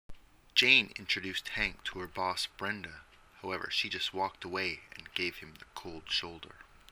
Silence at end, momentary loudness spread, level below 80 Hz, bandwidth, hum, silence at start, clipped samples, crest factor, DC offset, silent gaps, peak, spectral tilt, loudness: 0.25 s; 21 LU; -58 dBFS; 19 kHz; none; 0.1 s; under 0.1%; 28 dB; under 0.1%; none; -8 dBFS; -2 dB/octave; -32 LUFS